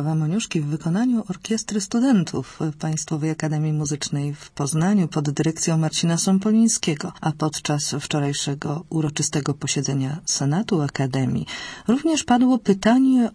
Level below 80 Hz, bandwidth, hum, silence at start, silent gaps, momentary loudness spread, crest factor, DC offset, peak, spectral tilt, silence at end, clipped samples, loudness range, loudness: -56 dBFS; 11 kHz; none; 0 s; none; 8 LU; 16 dB; under 0.1%; -6 dBFS; -5 dB/octave; 0 s; under 0.1%; 3 LU; -22 LUFS